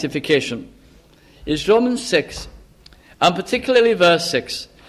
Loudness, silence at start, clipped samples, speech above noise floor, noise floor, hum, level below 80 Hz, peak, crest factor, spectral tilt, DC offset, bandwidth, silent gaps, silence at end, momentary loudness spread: -18 LUFS; 0 s; under 0.1%; 31 dB; -49 dBFS; none; -46 dBFS; -2 dBFS; 18 dB; -4 dB/octave; under 0.1%; 14 kHz; none; 0.25 s; 17 LU